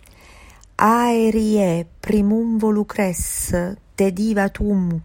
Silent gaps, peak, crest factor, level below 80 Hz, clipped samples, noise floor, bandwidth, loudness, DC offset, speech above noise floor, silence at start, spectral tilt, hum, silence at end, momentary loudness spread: none; -2 dBFS; 18 dB; -38 dBFS; under 0.1%; -45 dBFS; 16.5 kHz; -19 LUFS; under 0.1%; 27 dB; 0.8 s; -6 dB/octave; none; 0 s; 6 LU